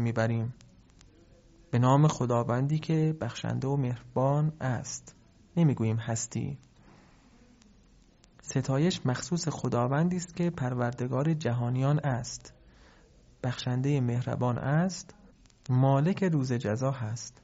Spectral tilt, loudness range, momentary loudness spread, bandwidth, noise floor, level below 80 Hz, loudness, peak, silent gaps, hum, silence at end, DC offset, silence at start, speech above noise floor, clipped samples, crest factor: -7 dB/octave; 5 LU; 11 LU; 8 kHz; -60 dBFS; -60 dBFS; -29 LUFS; -10 dBFS; none; none; 0.15 s; under 0.1%; 0 s; 32 dB; under 0.1%; 20 dB